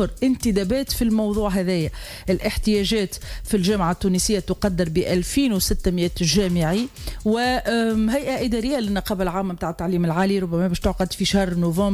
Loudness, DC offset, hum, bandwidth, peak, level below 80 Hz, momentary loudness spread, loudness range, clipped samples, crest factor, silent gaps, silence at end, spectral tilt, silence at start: -22 LUFS; under 0.1%; none; 16 kHz; -8 dBFS; -34 dBFS; 5 LU; 2 LU; under 0.1%; 14 dB; none; 0 s; -5 dB/octave; 0 s